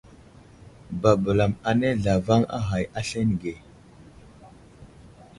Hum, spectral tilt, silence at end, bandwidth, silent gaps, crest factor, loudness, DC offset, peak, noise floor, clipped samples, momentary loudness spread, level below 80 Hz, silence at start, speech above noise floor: none; -7 dB/octave; 0.3 s; 11.5 kHz; none; 22 dB; -24 LUFS; under 0.1%; -4 dBFS; -50 dBFS; under 0.1%; 10 LU; -46 dBFS; 0.65 s; 27 dB